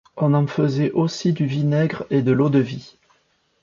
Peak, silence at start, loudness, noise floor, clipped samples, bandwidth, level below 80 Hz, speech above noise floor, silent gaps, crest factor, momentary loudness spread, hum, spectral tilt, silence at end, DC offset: -6 dBFS; 0.15 s; -20 LUFS; -64 dBFS; under 0.1%; 7.4 kHz; -58 dBFS; 45 dB; none; 16 dB; 4 LU; none; -7.5 dB/octave; 0.75 s; under 0.1%